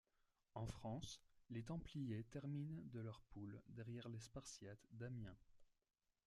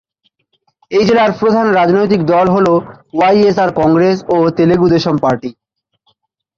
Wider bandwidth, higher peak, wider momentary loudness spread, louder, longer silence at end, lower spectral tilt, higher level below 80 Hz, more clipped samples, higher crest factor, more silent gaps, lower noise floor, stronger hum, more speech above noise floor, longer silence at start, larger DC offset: first, 12.5 kHz vs 7.4 kHz; second, -36 dBFS vs -2 dBFS; about the same, 7 LU vs 6 LU; second, -54 LUFS vs -12 LUFS; second, 0.6 s vs 1.05 s; second, -6 dB/octave vs -7.5 dB/octave; second, -70 dBFS vs -46 dBFS; neither; first, 18 dB vs 12 dB; neither; first, -85 dBFS vs -62 dBFS; neither; second, 33 dB vs 52 dB; second, 0.55 s vs 0.9 s; neither